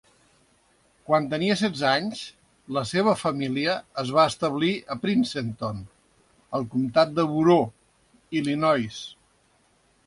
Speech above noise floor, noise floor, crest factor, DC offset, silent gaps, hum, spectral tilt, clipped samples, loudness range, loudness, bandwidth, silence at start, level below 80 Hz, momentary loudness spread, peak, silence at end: 40 dB; -64 dBFS; 20 dB; under 0.1%; none; none; -5.5 dB/octave; under 0.1%; 2 LU; -24 LUFS; 11.5 kHz; 1.1 s; -60 dBFS; 11 LU; -6 dBFS; 0.95 s